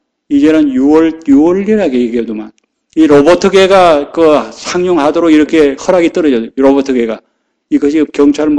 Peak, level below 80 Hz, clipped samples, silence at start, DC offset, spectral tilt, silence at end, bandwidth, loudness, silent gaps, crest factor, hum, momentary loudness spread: 0 dBFS; -42 dBFS; 1%; 0.3 s; under 0.1%; -5.5 dB/octave; 0 s; 10 kHz; -9 LUFS; none; 8 dB; none; 9 LU